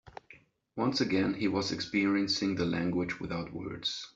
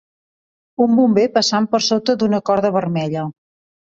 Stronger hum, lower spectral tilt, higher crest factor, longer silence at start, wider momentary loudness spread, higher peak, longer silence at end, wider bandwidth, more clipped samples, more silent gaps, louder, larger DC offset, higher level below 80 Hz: neither; about the same, -5 dB/octave vs -5 dB/octave; about the same, 16 dB vs 16 dB; second, 0.05 s vs 0.8 s; about the same, 10 LU vs 10 LU; second, -16 dBFS vs -2 dBFS; second, 0.1 s vs 0.65 s; about the same, 7.8 kHz vs 7.8 kHz; neither; neither; second, -31 LUFS vs -17 LUFS; neither; about the same, -62 dBFS vs -60 dBFS